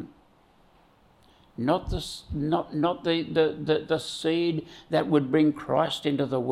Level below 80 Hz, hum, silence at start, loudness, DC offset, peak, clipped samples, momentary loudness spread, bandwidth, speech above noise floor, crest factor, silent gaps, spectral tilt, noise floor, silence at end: -48 dBFS; none; 0 s; -26 LUFS; under 0.1%; -10 dBFS; under 0.1%; 9 LU; 13 kHz; 34 dB; 18 dB; none; -6 dB/octave; -60 dBFS; 0 s